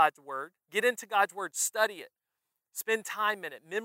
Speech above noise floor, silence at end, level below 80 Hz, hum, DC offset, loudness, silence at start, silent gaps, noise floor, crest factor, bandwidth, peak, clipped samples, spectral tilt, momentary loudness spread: 54 dB; 0 s; under -90 dBFS; none; under 0.1%; -31 LUFS; 0 s; none; -86 dBFS; 22 dB; 16 kHz; -10 dBFS; under 0.1%; -0.5 dB/octave; 11 LU